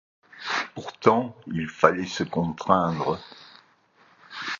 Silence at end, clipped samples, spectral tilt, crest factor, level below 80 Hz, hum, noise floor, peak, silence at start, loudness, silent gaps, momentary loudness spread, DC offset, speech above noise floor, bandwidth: 0.05 s; under 0.1%; -5.5 dB/octave; 26 dB; -58 dBFS; none; -60 dBFS; 0 dBFS; 0.35 s; -25 LUFS; none; 13 LU; under 0.1%; 35 dB; 7.4 kHz